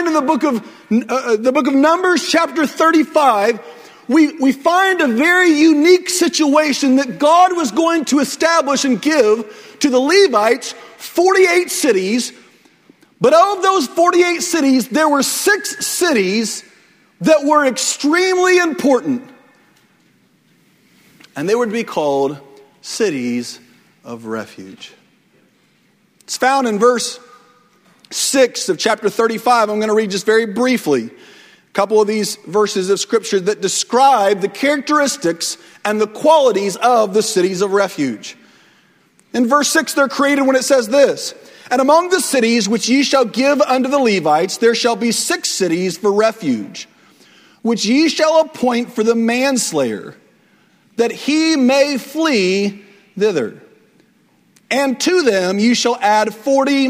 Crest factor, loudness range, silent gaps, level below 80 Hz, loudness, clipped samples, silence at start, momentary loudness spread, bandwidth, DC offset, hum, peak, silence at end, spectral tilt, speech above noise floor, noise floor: 16 dB; 7 LU; none; -64 dBFS; -15 LUFS; under 0.1%; 0 s; 11 LU; 16 kHz; under 0.1%; none; 0 dBFS; 0 s; -3 dB/octave; 42 dB; -56 dBFS